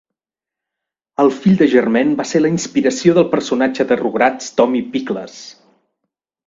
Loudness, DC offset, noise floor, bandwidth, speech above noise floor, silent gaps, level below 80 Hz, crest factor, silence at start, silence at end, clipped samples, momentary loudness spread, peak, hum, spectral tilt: -15 LUFS; under 0.1%; -87 dBFS; 7.8 kHz; 72 dB; none; -58 dBFS; 16 dB; 1.2 s; 0.95 s; under 0.1%; 11 LU; 0 dBFS; none; -5.5 dB/octave